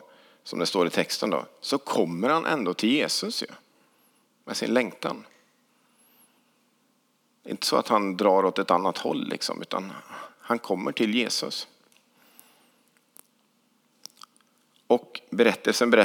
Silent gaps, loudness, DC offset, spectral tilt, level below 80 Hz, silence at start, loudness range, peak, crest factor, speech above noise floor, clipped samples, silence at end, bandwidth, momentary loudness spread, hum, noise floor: none; -26 LUFS; under 0.1%; -3.5 dB/octave; under -90 dBFS; 0.45 s; 7 LU; -4 dBFS; 24 dB; 43 dB; under 0.1%; 0 s; 19.5 kHz; 17 LU; none; -68 dBFS